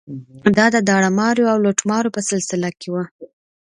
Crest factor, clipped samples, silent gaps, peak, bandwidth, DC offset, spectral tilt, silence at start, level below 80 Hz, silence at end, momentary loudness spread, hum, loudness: 18 dB; under 0.1%; 3.11-3.19 s; 0 dBFS; 11 kHz; under 0.1%; -4.5 dB/octave; 0.1 s; -58 dBFS; 0.45 s; 11 LU; none; -17 LUFS